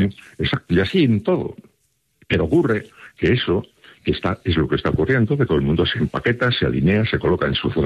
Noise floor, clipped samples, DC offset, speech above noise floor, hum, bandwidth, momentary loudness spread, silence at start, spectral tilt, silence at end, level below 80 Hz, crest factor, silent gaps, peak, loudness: -67 dBFS; under 0.1%; under 0.1%; 48 dB; none; 11 kHz; 6 LU; 0 s; -8 dB/octave; 0 s; -40 dBFS; 14 dB; none; -6 dBFS; -20 LUFS